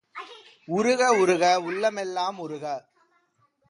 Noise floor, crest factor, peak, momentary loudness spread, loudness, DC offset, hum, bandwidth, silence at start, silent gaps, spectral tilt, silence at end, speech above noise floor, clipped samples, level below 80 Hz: -68 dBFS; 18 dB; -8 dBFS; 18 LU; -24 LUFS; under 0.1%; none; 11.5 kHz; 0.15 s; none; -4 dB/octave; 0.9 s; 44 dB; under 0.1%; -76 dBFS